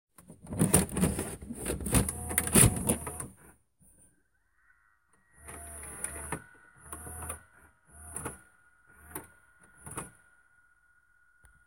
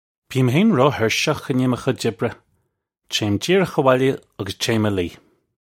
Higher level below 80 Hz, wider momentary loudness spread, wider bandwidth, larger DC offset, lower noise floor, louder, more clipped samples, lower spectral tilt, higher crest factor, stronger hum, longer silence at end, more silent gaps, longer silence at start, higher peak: first, -46 dBFS vs -54 dBFS; first, 22 LU vs 11 LU; about the same, 17 kHz vs 16.5 kHz; neither; about the same, -73 dBFS vs -72 dBFS; second, -30 LUFS vs -20 LUFS; neither; second, -4 dB/octave vs -5.5 dB/octave; first, 30 dB vs 20 dB; neither; first, 1.55 s vs 0.5 s; neither; about the same, 0.2 s vs 0.3 s; about the same, -4 dBFS vs -2 dBFS